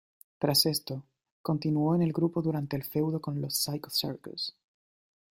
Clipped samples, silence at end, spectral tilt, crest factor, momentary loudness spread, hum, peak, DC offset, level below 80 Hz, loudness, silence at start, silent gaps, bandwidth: under 0.1%; 0.8 s; -5 dB/octave; 20 dB; 12 LU; none; -12 dBFS; under 0.1%; -68 dBFS; -30 LUFS; 0.4 s; 1.31-1.44 s; 16.5 kHz